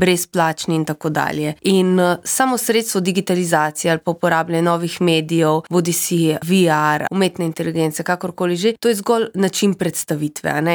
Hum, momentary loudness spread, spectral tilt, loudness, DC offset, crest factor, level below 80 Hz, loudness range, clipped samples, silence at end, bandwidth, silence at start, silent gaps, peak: none; 5 LU; -4.5 dB/octave; -18 LUFS; under 0.1%; 14 dB; -62 dBFS; 2 LU; under 0.1%; 0 s; over 20 kHz; 0 s; none; -2 dBFS